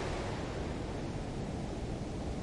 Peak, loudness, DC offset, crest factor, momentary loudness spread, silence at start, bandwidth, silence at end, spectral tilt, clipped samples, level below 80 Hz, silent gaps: -26 dBFS; -39 LUFS; under 0.1%; 12 dB; 2 LU; 0 s; 11.5 kHz; 0 s; -6 dB/octave; under 0.1%; -44 dBFS; none